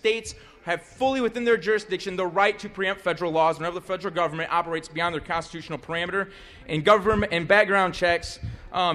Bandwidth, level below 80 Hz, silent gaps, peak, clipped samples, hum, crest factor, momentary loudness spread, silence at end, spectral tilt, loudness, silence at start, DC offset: 13 kHz; -48 dBFS; none; -6 dBFS; under 0.1%; none; 20 dB; 12 LU; 0 s; -4.5 dB/octave; -24 LUFS; 0.05 s; under 0.1%